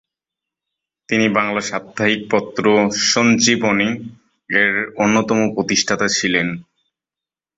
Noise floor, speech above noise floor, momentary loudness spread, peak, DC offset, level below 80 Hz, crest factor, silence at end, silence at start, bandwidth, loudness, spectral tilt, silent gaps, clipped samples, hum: -89 dBFS; 72 dB; 8 LU; -2 dBFS; under 0.1%; -56 dBFS; 18 dB; 0.95 s; 1.1 s; 8 kHz; -16 LUFS; -3.5 dB/octave; none; under 0.1%; none